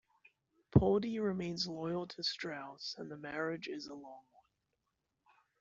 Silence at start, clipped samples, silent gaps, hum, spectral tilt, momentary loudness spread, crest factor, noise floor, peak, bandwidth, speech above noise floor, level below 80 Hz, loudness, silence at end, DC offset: 0.75 s; under 0.1%; none; none; -6 dB/octave; 15 LU; 26 dB; -85 dBFS; -12 dBFS; 7.8 kHz; 49 dB; -58 dBFS; -37 LUFS; 1.4 s; under 0.1%